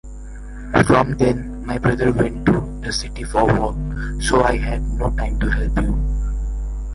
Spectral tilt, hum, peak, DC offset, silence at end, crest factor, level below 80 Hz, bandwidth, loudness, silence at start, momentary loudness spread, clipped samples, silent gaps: -6 dB/octave; none; -2 dBFS; under 0.1%; 0 s; 18 dB; -24 dBFS; 11.5 kHz; -20 LUFS; 0.05 s; 11 LU; under 0.1%; none